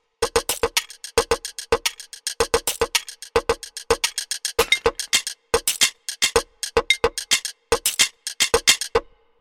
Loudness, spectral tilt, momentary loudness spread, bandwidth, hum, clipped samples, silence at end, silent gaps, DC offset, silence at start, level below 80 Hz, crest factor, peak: -21 LUFS; -0.5 dB/octave; 7 LU; 17.5 kHz; none; under 0.1%; 0.4 s; none; under 0.1%; 0.2 s; -42 dBFS; 22 dB; 0 dBFS